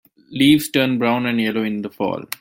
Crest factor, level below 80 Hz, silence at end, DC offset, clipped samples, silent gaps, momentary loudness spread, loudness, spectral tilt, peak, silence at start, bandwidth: 16 dB; -58 dBFS; 0.05 s; under 0.1%; under 0.1%; none; 10 LU; -18 LUFS; -5 dB/octave; -2 dBFS; 0.3 s; 17 kHz